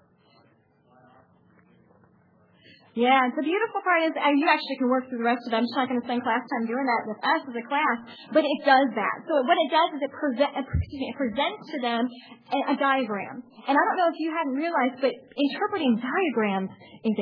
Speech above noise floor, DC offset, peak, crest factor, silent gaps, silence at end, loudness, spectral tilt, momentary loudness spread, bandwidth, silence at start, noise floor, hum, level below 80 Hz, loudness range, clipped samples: 37 dB; under 0.1%; -6 dBFS; 20 dB; none; 0 s; -25 LUFS; -8 dB/octave; 9 LU; 5.4 kHz; 2.95 s; -62 dBFS; none; -50 dBFS; 3 LU; under 0.1%